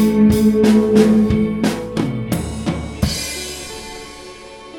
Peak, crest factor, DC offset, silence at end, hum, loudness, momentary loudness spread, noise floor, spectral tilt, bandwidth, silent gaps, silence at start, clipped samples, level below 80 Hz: 0 dBFS; 16 dB; under 0.1%; 0 s; none; -16 LUFS; 20 LU; -36 dBFS; -6 dB/octave; 17 kHz; none; 0 s; under 0.1%; -34 dBFS